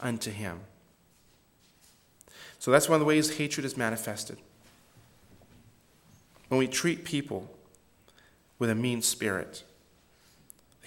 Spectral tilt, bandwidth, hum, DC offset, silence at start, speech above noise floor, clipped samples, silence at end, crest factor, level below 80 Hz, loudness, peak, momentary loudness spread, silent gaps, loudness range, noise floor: -4 dB/octave; 17 kHz; none; under 0.1%; 0 s; 35 dB; under 0.1%; 1.25 s; 26 dB; -68 dBFS; -29 LUFS; -6 dBFS; 22 LU; none; 6 LU; -64 dBFS